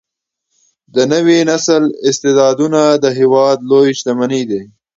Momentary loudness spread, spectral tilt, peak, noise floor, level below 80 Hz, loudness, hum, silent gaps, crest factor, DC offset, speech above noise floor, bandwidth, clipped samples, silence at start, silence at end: 6 LU; -4.5 dB/octave; 0 dBFS; -74 dBFS; -60 dBFS; -12 LUFS; none; none; 12 dB; under 0.1%; 63 dB; 7.8 kHz; under 0.1%; 0.95 s; 0.3 s